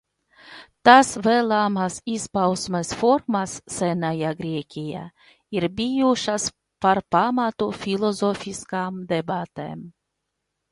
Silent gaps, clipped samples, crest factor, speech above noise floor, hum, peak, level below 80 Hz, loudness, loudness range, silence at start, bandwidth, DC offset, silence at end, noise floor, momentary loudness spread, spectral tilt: none; under 0.1%; 22 dB; 57 dB; none; 0 dBFS; -58 dBFS; -22 LUFS; 6 LU; 0.45 s; 11.5 kHz; under 0.1%; 0.8 s; -79 dBFS; 11 LU; -4.5 dB/octave